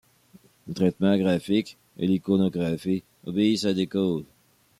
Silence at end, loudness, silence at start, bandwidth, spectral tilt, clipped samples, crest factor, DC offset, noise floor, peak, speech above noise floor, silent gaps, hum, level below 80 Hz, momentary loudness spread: 0.55 s; -25 LUFS; 0.65 s; 13 kHz; -7 dB/octave; under 0.1%; 16 dB; under 0.1%; -56 dBFS; -8 dBFS; 32 dB; none; none; -64 dBFS; 8 LU